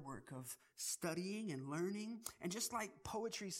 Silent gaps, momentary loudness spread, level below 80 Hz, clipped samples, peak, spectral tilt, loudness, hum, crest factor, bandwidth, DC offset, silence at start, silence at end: none; 9 LU; -74 dBFS; under 0.1%; -28 dBFS; -3.5 dB/octave; -45 LUFS; none; 18 dB; 16 kHz; under 0.1%; 0 s; 0 s